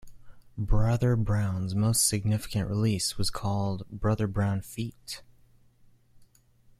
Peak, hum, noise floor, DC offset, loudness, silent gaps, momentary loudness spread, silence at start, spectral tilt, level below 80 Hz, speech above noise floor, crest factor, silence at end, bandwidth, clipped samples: -10 dBFS; none; -60 dBFS; under 0.1%; -28 LUFS; none; 13 LU; 0.05 s; -5 dB/octave; -40 dBFS; 33 dB; 18 dB; 1.55 s; 15 kHz; under 0.1%